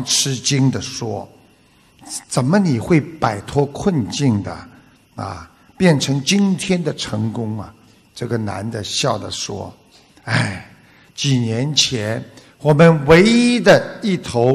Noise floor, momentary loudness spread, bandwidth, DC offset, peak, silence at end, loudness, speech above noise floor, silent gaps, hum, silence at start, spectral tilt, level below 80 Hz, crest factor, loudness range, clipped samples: -52 dBFS; 18 LU; 13 kHz; under 0.1%; -2 dBFS; 0 s; -17 LUFS; 36 dB; none; none; 0 s; -5 dB/octave; -48 dBFS; 16 dB; 9 LU; under 0.1%